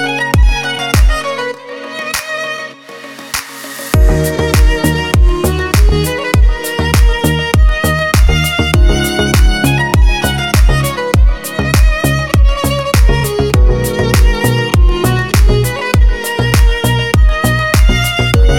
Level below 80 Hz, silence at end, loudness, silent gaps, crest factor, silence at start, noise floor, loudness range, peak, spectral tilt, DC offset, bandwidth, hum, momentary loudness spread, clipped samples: -12 dBFS; 0 s; -12 LUFS; none; 10 dB; 0 s; -30 dBFS; 4 LU; 0 dBFS; -5 dB/octave; under 0.1%; 17.5 kHz; none; 7 LU; under 0.1%